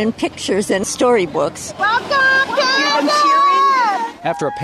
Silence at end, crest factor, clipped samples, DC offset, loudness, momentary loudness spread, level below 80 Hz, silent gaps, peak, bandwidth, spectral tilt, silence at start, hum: 0 s; 10 dB; under 0.1%; under 0.1%; -15 LUFS; 9 LU; -54 dBFS; none; -6 dBFS; 14 kHz; -3 dB/octave; 0 s; none